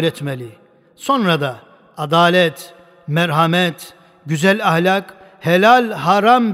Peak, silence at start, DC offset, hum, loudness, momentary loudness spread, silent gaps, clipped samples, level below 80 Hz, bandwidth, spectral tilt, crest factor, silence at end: 0 dBFS; 0 s; under 0.1%; none; -15 LUFS; 16 LU; none; under 0.1%; -64 dBFS; 16 kHz; -5.5 dB/octave; 16 dB; 0 s